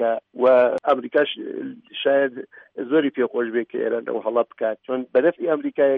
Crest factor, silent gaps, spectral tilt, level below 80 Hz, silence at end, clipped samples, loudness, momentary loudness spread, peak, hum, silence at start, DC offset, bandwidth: 16 dB; none; -7 dB/octave; -72 dBFS; 0 s; under 0.1%; -22 LUFS; 13 LU; -6 dBFS; none; 0 s; under 0.1%; 4.5 kHz